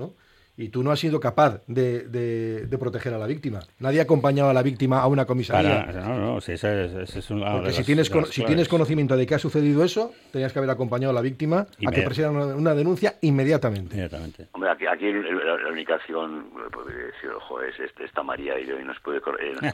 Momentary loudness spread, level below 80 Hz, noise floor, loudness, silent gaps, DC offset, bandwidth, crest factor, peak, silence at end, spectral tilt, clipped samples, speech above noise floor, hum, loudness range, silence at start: 12 LU; -52 dBFS; -50 dBFS; -24 LUFS; none; under 0.1%; 14.5 kHz; 18 dB; -6 dBFS; 0 s; -7 dB/octave; under 0.1%; 27 dB; none; 7 LU; 0 s